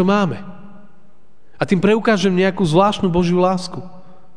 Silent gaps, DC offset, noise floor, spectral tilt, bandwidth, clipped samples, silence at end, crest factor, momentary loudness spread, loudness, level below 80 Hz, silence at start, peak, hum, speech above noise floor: none; 2%; -56 dBFS; -6.5 dB/octave; 10 kHz; under 0.1%; 0.4 s; 16 dB; 15 LU; -17 LUFS; -46 dBFS; 0 s; -2 dBFS; none; 40 dB